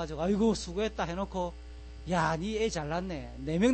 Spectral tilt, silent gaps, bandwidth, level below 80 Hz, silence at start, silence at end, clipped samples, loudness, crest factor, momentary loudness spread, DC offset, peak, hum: -5.5 dB/octave; none; 8.8 kHz; -46 dBFS; 0 s; 0 s; under 0.1%; -32 LUFS; 16 dB; 11 LU; under 0.1%; -14 dBFS; none